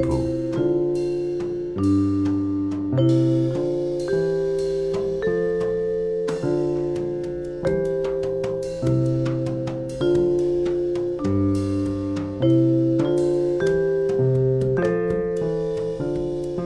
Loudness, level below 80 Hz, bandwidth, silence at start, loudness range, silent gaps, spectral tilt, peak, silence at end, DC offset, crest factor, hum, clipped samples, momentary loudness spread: -23 LUFS; -44 dBFS; 11 kHz; 0 s; 3 LU; none; -8.5 dB/octave; -8 dBFS; 0 s; under 0.1%; 14 dB; none; under 0.1%; 6 LU